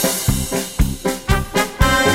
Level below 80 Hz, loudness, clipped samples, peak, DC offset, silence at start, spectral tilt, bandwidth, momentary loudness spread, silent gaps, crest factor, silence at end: -24 dBFS; -19 LUFS; under 0.1%; 0 dBFS; under 0.1%; 0 s; -4 dB/octave; 16.5 kHz; 6 LU; none; 18 dB; 0 s